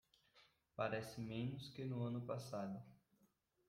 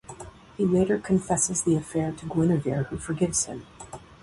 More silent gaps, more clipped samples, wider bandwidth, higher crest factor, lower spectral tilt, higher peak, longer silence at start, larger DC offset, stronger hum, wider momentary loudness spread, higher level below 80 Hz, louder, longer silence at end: neither; neither; first, 16 kHz vs 11.5 kHz; about the same, 20 dB vs 16 dB; about the same, -6.5 dB/octave vs -5.5 dB/octave; second, -28 dBFS vs -10 dBFS; first, 0.35 s vs 0.1 s; neither; neither; second, 9 LU vs 20 LU; second, -78 dBFS vs -50 dBFS; second, -47 LUFS vs -25 LUFS; first, 0.7 s vs 0.2 s